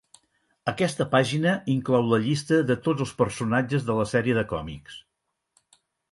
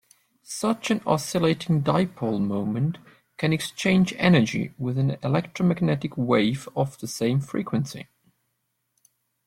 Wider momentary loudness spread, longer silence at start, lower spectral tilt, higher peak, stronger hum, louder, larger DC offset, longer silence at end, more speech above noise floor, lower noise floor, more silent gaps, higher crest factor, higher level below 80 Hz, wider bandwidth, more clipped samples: first, 11 LU vs 8 LU; first, 0.65 s vs 0.5 s; about the same, -6 dB/octave vs -6 dB/octave; about the same, -6 dBFS vs -6 dBFS; neither; about the same, -25 LUFS vs -24 LUFS; neither; second, 1.1 s vs 1.45 s; first, 56 dB vs 52 dB; first, -80 dBFS vs -76 dBFS; neither; about the same, 20 dB vs 20 dB; first, -54 dBFS vs -60 dBFS; second, 11.5 kHz vs 16 kHz; neither